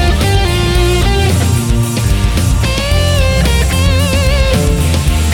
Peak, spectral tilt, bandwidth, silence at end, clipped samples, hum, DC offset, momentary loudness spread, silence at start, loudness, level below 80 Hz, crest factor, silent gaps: 0 dBFS; -5 dB/octave; 19 kHz; 0 s; under 0.1%; none; under 0.1%; 2 LU; 0 s; -12 LUFS; -14 dBFS; 10 dB; none